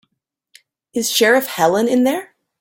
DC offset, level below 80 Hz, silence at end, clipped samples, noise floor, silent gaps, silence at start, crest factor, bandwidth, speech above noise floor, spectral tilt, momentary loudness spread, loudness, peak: under 0.1%; -62 dBFS; 0.35 s; under 0.1%; -74 dBFS; none; 0.95 s; 16 dB; 17 kHz; 58 dB; -3 dB/octave; 11 LU; -16 LUFS; -2 dBFS